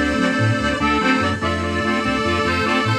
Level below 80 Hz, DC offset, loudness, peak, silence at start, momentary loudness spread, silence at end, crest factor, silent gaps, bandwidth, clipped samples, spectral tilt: -38 dBFS; under 0.1%; -18 LUFS; -4 dBFS; 0 s; 3 LU; 0 s; 14 dB; none; 13 kHz; under 0.1%; -5.5 dB/octave